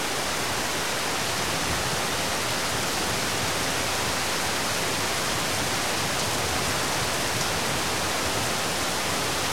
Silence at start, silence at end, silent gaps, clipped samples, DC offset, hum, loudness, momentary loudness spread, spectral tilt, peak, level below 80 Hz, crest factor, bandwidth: 0 s; 0 s; none; under 0.1%; 1%; none; -25 LUFS; 1 LU; -2 dB/octave; -12 dBFS; -48 dBFS; 14 dB; 16.5 kHz